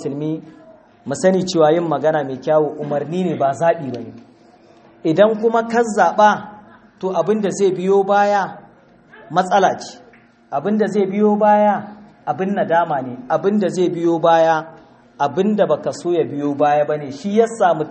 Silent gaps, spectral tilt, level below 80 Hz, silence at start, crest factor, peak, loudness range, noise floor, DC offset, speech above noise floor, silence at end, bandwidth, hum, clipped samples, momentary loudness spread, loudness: none; -6 dB/octave; -64 dBFS; 0 s; 18 dB; 0 dBFS; 2 LU; -48 dBFS; under 0.1%; 31 dB; 0 s; 8.8 kHz; none; under 0.1%; 12 LU; -17 LUFS